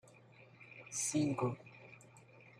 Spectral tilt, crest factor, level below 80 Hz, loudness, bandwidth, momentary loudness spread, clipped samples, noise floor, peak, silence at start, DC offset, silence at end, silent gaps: -4.5 dB/octave; 20 dB; -76 dBFS; -37 LUFS; 15.5 kHz; 24 LU; under 0.1%; -62 dBFS; -22 dBFS; 0.05 s; under 0.1%; 0.1 s; none